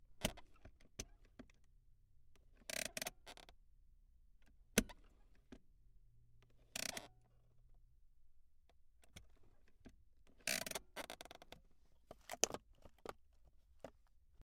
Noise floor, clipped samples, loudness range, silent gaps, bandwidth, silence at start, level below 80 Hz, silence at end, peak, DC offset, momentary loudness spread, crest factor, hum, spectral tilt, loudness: -69 dBFS; under 0.1%; 7 LU; none; 16.5 kHz; 0 s; -64 dBFS; 0.15 s; -12 dBFS; under 0.1%; 25 LU; 40 dB; none; -2 dB/octave; -45 LUFS